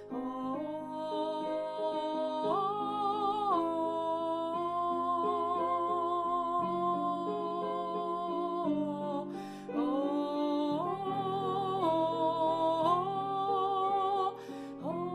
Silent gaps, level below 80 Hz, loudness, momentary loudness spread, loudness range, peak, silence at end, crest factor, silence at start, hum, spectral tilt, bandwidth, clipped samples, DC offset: none; -72 dBFS; -33 LUFS; 7 LU; 3 LU; -16 dBFS; 0 s; 16 dB; 0 s; none; -7 dB/octave; 12 kHz; under 0.1%; under 0.1%